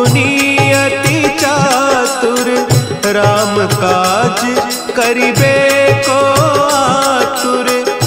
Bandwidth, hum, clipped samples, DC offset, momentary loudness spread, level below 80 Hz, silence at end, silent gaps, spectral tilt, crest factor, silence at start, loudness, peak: 16.5 kHz; none; under 0.1%; under 0.1%; 4 LU; -42 dBFS; 0 s; none; -4 dB/octave; 12 dB; 0 s; -11 LUFS; 0 dBFS